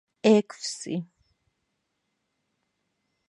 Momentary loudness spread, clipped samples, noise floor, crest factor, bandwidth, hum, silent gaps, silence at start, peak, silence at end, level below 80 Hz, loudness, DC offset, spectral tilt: 13 LU; under 0.1%; -78 dBFS; 24 dB; 11.5 kHz; none; none; 0.25 s; -6 dBFS; 2.25 s; -76 dBFS; -25 LUFS; under 0.1%; -5 dB/octave